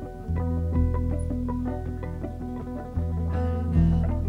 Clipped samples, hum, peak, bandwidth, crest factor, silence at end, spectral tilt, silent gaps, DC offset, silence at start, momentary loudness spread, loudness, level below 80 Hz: under 0.1%; none; -10 dBFS; 10.5 kHz; 16 dB; 0 s; -10 dB/octave; none; under 0.1%; 0 s; 11 LU; -28 LUFS; -32 dBFS